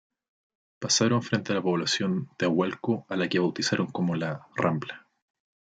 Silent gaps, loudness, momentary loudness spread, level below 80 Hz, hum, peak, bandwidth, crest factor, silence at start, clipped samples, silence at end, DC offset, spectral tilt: none; -27 LUFS; 8 LU; -72 dBFS; none; -10 dBFS; 9.4 kHz; 18 dB; 0.8 s; under 0.1%; 0.75 s; under 0.1%; -4.5 dB/octave